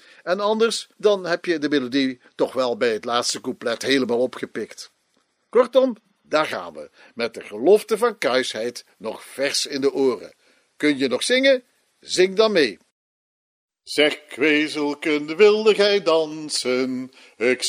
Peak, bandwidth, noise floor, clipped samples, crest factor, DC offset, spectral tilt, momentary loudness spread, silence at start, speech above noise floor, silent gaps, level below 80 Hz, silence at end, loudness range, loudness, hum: -2 dBFS; 15.5 kHz; -67 dBFS; under 0.1%; 20 dB; under 0.1%; -3 dB/octave; 14 LU; 0.25 s; 47 dB; 12.92-13.69 s; -76 dBFS; 0 s; 4 LU; -21 LUFS; none